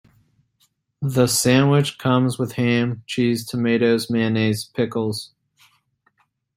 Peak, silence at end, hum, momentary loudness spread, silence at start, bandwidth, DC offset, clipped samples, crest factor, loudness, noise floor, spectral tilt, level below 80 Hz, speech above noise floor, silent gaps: -2 dBFS; 1.3 s; none; 9 LU; 1 s; 16 kHz; under 0.1%; under 0.1%; 18 dB; -20 LUFS; -66 dBFS; -5.5 dB/octave; -58 dBFS; 46 dB; none